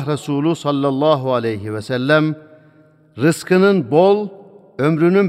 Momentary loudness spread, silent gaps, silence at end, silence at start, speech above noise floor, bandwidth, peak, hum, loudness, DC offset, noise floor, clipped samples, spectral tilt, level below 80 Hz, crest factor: 9 LU; none; 0 s; 0 s; 35 dB; 15 kHz; -2 dBFS; none; -17 LUFS; under 0.1%; -50 dBFS; under 0.1%; -6.5 dB/octave; -64 dBFS; 16 dB